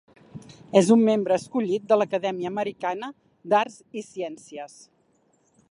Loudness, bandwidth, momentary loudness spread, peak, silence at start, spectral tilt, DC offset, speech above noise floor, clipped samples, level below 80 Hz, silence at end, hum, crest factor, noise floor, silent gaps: -24 LUFS; 11.5 kHz; 22 LU; -4 dBFS; 0.35 s; -5.5 dB/octave; under 0.1%; 42 dB; under 0.1%; -70 dBFS; 1.05 s; none; 22 dB; -65 dBFS; none